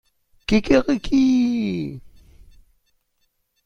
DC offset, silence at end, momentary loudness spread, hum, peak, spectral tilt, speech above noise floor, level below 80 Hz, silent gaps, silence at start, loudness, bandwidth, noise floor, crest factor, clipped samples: under 0.1%; 1.25 s; 16 LU; none; -2 dBFS; -6 dB/octave; 51 dB; -40 dBFS; none; 0.5 s; -20 LUFS; 7.4 kHz; -69 dBFS; 20 dB; under 0.1%